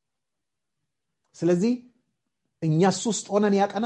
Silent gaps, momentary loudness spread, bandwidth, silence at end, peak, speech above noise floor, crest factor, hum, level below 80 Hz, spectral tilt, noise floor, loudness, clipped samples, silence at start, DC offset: none; 7 LU; 10.5 kHz; 0 s; -8 dBFS; 64 dB; 18 dB; none; -70 dBFS; -5.5 dB/octave; -86 dBFS; -24 LUFS; under 0.1%; 1.4 s; under 0.1%